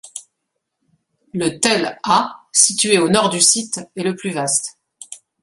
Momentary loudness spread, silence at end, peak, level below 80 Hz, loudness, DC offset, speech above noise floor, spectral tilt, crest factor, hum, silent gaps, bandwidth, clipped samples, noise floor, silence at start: 21 LU; 0.25 s; 0 dBFS; -60 dBFS; -16 LUFS; under 0.1%; 59 dB; -2 dB/octave; 20 dB; none; none; 12 kHz; under 0.1%; -76 dBFS; 0.05 s